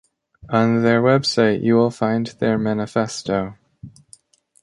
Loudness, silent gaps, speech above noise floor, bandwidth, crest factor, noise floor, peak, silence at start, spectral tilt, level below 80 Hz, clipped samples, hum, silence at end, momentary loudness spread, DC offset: -19 LUFS; none; 34 dB; 11 kHz; 16 dB; -52 dBFS; -4 dBFS; 0.45 s; -6 dB/octave; -54 dBFS; under 0.1%; none; 0.75 s; 7 LU; under 0.1%